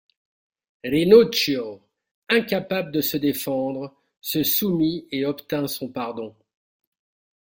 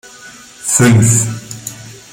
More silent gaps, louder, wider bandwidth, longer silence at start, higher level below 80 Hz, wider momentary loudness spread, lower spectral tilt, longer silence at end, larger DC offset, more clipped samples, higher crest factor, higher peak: first, 2.11-2.22 s, 4.17-4.22 s vs none; second, -22 LUFS vs -11 LUFS; about the same, 17 kHz vs 16.5 kHz; first, 0.85 s vs 0.25 s; second, -60 dBFS vs -44 dBFS; about the same, 19 LU vs 19 LU; about the same, -4.5 dB/octave vs -4.5 dB/octave; first, 1.15 s vs 0.15 s; neither; neither; first, 20 dB vs 14 dB; about the same, -2 dBFS vs 0 dBFS